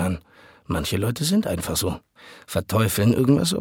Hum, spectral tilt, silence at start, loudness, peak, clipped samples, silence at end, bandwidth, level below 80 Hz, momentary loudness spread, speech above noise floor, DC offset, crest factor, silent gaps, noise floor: none; -5 dB/octave; 0 s; -22 LUFS; -6 dBFS; under 0.1%; 0 s; 18.5 kHz; -44 dBFS; 10 LU; 30 dB; under 0.1%; 18 dB; none; -52 dBFS